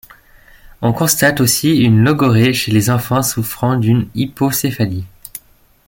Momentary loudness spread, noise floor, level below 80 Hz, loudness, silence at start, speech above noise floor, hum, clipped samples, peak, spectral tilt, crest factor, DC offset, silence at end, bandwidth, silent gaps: 10 LU; -49 dBFS; -44 dBFS; -14 LUFS; 0.8 s; 35 dB; none; under 0.1%; 0 dBFS; -5 dB/octave; 14 dB; under 0.1%; 0.5 s; 17 kHz; none